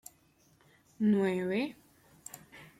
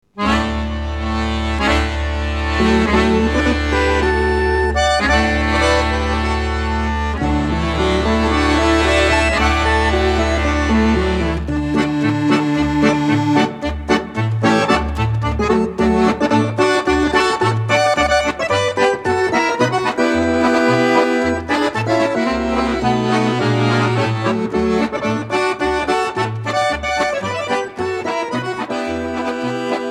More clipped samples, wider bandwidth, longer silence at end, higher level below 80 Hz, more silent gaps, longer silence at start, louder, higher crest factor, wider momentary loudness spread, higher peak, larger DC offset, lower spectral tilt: neither; first, 15 kHz vs 12 kHz; first, 0.15 s vs 0 s; second, -74 dBFS vs -26 dBFS; neither; first, 1 s vs 0.15 s; second, -31 LUFS vs -17 LUFS; about the same, 16 dB vs 14 dB; first, 22 LU vs 7 LU; second, -18 dBFS vs -2 dBFS; neither; about the same, -6.5 dB/octave vs -5.5 dB/octave